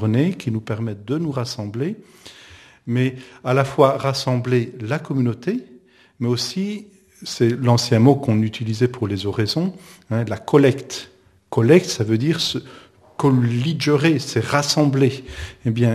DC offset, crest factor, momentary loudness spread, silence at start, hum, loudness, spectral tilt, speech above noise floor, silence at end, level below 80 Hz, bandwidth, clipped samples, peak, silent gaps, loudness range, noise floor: under 0.1%; 20 dB; 12 LU; 0 s; none; -20 LUFS; -6 dB/octave; 30 dB; 0 s; -52 dBFS; 14 kHz; under 0.1%; 0 dBFS; none; 5 LU; -50 dBFS